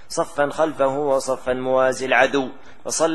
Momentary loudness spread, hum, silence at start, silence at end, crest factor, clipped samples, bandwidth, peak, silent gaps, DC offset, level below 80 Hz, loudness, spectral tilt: 8 LU; none; 0.1 s; 0 s; 20 dB; under 0.1%; 12.5 kHz; -2 dBFS; none; 1%; -54 dBFS; -20 LUFS; -3 dB/octave